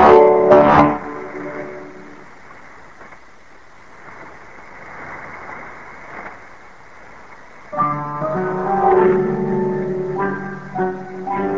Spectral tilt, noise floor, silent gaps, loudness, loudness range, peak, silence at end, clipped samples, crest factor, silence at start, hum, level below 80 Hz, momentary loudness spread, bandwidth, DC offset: -8 dB/octave; -46 dBFS; none; -17 LUFS; 19 LU; 0 dBFS; 0 s; under 0.1%; 18 dB; 0 s; none; -46 dBFS; 27 LU; 7.4 kHz; 0.8%